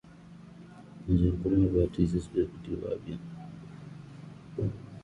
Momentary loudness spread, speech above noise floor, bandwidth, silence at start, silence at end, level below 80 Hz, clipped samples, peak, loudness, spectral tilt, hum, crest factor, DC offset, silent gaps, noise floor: 23 LU; 22 dB; 10 kHz; 0.05 s; 0 s; -42 dBFS; under 0.1%; -12 dBFS; -30 LUFS; -9.5 dB/octave; none; 20 dB; under 0.1%; none; -50 dBFS